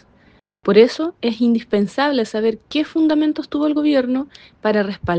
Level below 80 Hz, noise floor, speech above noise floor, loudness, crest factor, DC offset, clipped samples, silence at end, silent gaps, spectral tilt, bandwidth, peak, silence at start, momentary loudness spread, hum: -54 dBFS; -54 dBFS; 36 dB; -18 LUFS; 18 dB; under 0.1%; under 0.1%; 0 s; none; -6.5 dB/octave; 8.8 kHz; 0 dBFS; 0.65 s; 9 LU; none